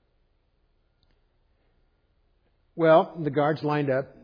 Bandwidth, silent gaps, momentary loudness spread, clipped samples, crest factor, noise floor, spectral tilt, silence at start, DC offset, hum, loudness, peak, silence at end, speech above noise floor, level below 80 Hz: 5.2 kHz; none; 8 LU; under 0.1%; 20 dB; -68 dBFS; -9.5 dB/octave; 2.75 s; under 0.1%; none; -23 LUFS; -8 dBFS; 0.2 s; 45 dB; -66 dBFS